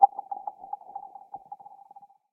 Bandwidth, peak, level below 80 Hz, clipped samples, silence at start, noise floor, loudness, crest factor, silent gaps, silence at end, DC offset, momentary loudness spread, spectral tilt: 1.4 kHz; -4 dBFS; -84 dBFS; under 0.1%; 0 s; -54 dBFS; -34 LUFS; 26 dB; none; 0.75 s; under 0.1%; 15 LU; -8 dB/octave